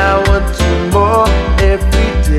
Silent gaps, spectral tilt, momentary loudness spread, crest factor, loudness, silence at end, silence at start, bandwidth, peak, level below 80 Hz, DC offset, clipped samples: none; -6 dB/octave; 3 LU; 10 dB; -12 LUFS; 0 s; 0 s; 13.5 kHz; 0 dBFS; -14 dBFS; under 0.1%; under 0.1%